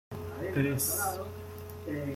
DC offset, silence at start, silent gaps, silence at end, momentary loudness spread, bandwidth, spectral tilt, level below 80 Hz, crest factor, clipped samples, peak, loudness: under 0.1%; 0.1 s; none; 0 s; 14 LU; 16.5 kHz; -4.5 dB/octave; -60 dBFS; 18 dB; under 0.1%; -16 dBFS; -33 LUFS